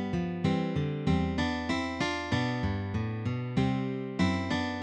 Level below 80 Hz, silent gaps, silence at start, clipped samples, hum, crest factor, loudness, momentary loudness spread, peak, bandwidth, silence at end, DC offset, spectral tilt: -48 dBFS; none; 0 s; under 0.1%; none; 16 dB; -31 LUFS; 4 LU; -14 dBFS; 9.8 kHz; 0 s; under 0.1%; -6.5 dB/octave